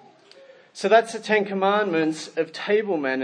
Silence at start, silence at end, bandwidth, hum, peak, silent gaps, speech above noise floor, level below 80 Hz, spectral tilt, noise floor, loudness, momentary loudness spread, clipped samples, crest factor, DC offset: 0.75 s; 0 s; 10.5 kHz; none; -2 dBFS; none; 28 dB; -82 dBFS; -4.5 dB/octave; -50 dBFS; -22 LUFS; 9 LU; under 0.1%; 20 dB; under 0.1%